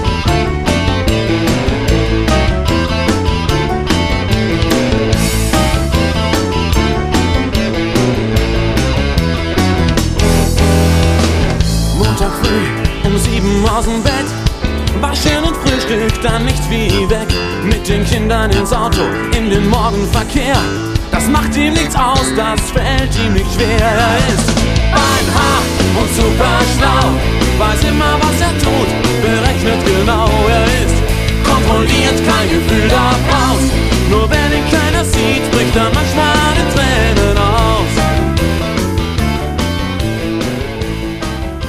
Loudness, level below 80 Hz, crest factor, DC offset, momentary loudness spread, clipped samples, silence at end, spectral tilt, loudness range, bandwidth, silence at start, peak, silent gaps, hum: -13 LUFS; -18 dBFS; 12 dB; under 0.1%; 4 LU; under 0.1%; 0 s; -5 dB/octave; 2 LU; 15.5 kHz; 0 s; 0 dBFS; none; none